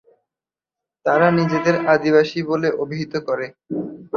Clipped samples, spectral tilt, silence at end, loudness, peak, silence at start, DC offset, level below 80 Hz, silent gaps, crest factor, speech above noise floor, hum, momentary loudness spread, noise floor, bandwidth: under 0.1%; -7 dB/octave; 0 s; -19 LUFS; -2 dBFS; 1.05 s; under 0.1%; -62 dBFS; none; 18 dB; 71 dB; none; 12 LU; -90 dBFS; 7 kHz